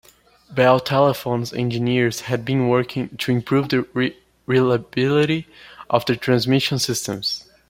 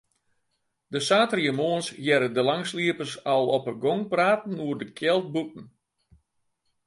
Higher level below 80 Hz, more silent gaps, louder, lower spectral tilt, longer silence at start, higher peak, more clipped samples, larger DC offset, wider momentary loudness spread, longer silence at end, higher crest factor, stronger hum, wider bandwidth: first, -56 dBFS vs -72 dBFS; neither; first, -20 LUFS vs -25 LUFS; about the same, -5.5 dB/octave vs -4.5 dB/octave; second, 0.5 s vs 0.9 s; first, -2 dBFS vs -6 dBFS; neither; neither; about the same, 8 LU vs 9 LU; second, 0.3 s vs 1.2 s; about the same, 18 dB vs 20 dB; neither; first, 16.5 kHz vs 11.5 kHz